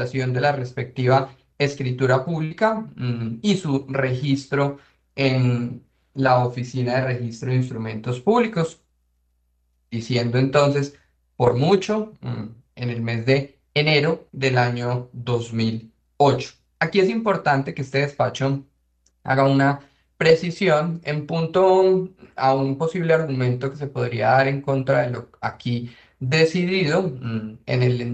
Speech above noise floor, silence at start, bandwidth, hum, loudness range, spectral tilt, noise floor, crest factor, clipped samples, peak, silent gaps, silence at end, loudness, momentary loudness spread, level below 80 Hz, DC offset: 46 dB; 0 s; 8.6 kHz; none; 3 LU; -6.5 dB/octave; -67 dBFS; 18 dB; under 0.1%; -4 dBFS; none; 0 s; -22 LUFS; 11 LU; -58 dBFS; under 0.1%